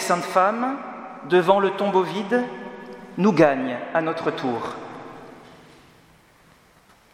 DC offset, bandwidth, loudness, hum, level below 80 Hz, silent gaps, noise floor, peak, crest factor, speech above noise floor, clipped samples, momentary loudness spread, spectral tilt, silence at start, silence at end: under 0.1%; 16 kHz; -22 LUFS; none; -66 dBFS; none; -55 dBFS; -2 dBFS; 22 dB; 34 dB; under 0.1%; 20 LU; -5.5 dB/octave; 0 s; 1.6 s